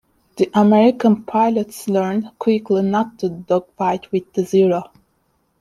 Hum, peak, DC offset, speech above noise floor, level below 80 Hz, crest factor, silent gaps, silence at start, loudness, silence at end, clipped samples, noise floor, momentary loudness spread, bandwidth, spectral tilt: none; -4 dBFS; under 0.1%; 48 dB; -62 dBFS; 14 dB; none; 0.35 s; -18 LUFS; 0.75 s; under 0.1%; -65 dBFS; 9 LU; 13 kHz; -7 dB/octave